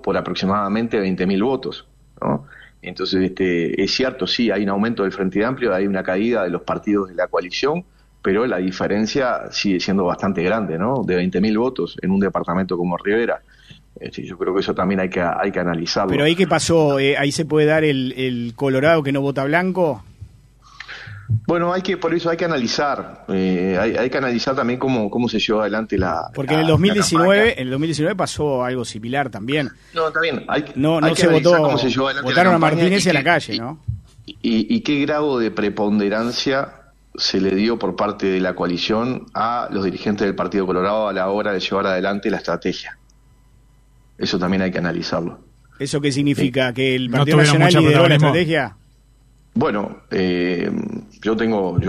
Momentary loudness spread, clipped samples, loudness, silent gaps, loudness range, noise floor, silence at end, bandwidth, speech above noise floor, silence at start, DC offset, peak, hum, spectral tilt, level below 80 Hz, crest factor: 10 LU; under 0.1%; -19 LUFS; none; 6 LU; -52 dBFS; 0 s; 13.5 kHz; 33 dB; 0.05 s; under 0.1%; 0 dBFS; none; -5.5 dB/octave; -48 dBFS; 18 dB